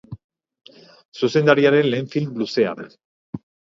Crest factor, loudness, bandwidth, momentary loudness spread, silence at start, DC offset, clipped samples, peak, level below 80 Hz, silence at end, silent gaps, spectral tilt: 22 dB; -19 LUFS; 7.6 kHz; 26 LU; 0.1 s; under 0.1%; under 0.1%; 0 dBFS; -62 dBFS; 0.4 s; 0.24-0.29 s, 1.05-1.12 s, 3.05-3.33 s; -6.5 dB/octave